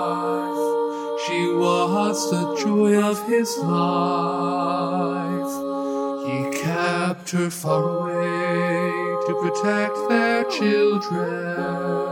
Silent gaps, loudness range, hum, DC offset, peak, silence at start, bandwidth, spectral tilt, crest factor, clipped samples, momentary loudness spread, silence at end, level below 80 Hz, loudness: none; 3 LU; none; under 0.1%; -4 dBFS; 0 s; 17 kHz; -5.5 dB/octave; 18 dB; under 0.1%; 6 LU; 0 s; -70 dBFS; -22 LUFS